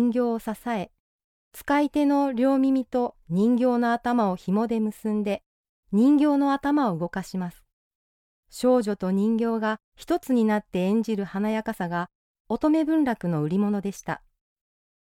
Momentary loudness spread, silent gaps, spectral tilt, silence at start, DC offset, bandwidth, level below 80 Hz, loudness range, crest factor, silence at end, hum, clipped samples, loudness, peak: 10 LU; 1.00-1.51 s, 5.46-5.83 s, 7.73-8.43 s, 9.84-9.92 s, 12.15-12.45 s; -7 dB/octave; 0 s; under 0.1%; 16.5 kHz; -58 dBFS; 3 LU; 14 dB; 1 s; none; under 0.1%; -25 LUFS; -12 dBFS